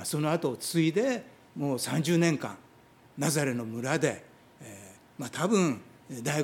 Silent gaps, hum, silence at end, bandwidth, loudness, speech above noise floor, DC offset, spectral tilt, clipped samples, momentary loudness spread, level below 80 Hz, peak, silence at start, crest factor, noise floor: none; none; 0 s; 17 kHz; -29 LUFS; 29 dB; under 0.1%; -5 dB/octave; under 0.1%; 21 LU; -74 dBFS; -10 dBFS; 0 s; 20 dB; -58 dBFS